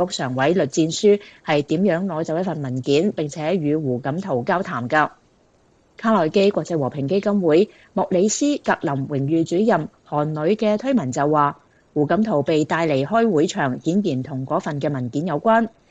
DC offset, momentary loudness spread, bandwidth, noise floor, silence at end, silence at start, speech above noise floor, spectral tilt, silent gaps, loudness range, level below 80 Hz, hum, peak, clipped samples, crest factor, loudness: under 0.1%; 6 LU; 9.2 kHz; -58 dBFS; 0.25 s; 0 s; 38 dB; -6 dB/octave; none; 2 LU; -62 dBFS; none; -4 dBFS; under 0.1%; 16 dB; -20 LUFS